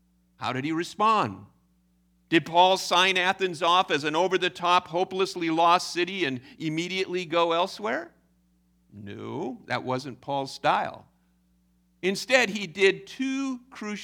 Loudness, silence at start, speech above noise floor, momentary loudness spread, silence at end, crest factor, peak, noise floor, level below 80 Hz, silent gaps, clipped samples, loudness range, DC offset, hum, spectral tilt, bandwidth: -25 LUFS; 0.4 s; 40 dB; 13 LU; 0 s; 22 dB; -6 dBFS; -66 dBFS; -70 dBFS; none; under 0.1%; 9 LU; under 0.1%; 60 Hz at -65 dBFS; -4 dB/octave; 17.5 kHz